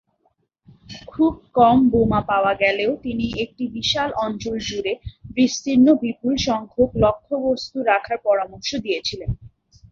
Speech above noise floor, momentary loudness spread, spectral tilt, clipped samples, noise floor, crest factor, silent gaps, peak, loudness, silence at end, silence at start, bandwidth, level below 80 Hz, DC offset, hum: 48 dB; 11 LU; -5 dB/octave; under 0.1%; -67 dBFS; 18 dB; none; -2 dBFS; -20 LUFS; 0.45 s; 0.9 s; 7.4 kHz; -42 dBFS; under 0.1%; none